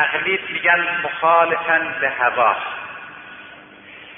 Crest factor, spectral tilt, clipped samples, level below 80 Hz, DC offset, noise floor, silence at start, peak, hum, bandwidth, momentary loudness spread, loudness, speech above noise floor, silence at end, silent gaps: 16 dB; -8 dB/octave; under 0.1%; -64 dBFS; under 0.1%; -41 dBFS; 0 s; -4 dBFS; none; 3.8 kHz; 20 LU; -18 LUFS; 23 dB; 0 s; none